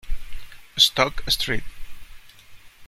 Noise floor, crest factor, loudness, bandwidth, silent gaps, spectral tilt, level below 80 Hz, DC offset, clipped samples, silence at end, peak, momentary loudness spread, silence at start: -45 dBFS; 22 dB; -20 LUFS; 16 kHz; none; -2 dB/octave; -36 dBFS; under 0.1%; under 0.1%; 0 s; -2 dBFS; 22 LU; 0.05 s